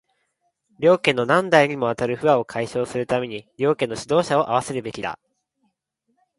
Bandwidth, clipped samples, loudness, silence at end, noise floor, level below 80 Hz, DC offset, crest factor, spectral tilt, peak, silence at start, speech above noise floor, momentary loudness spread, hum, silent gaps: 11.5 kHz; under 0.1%; -21 LUFS; 1.25 s; -73 dBFS; -60 dBFS; under 0.1%; 22 dB; -5 dB/octave; 0 dBFS; 0.8 s; 52 dB; 12 LU; none; none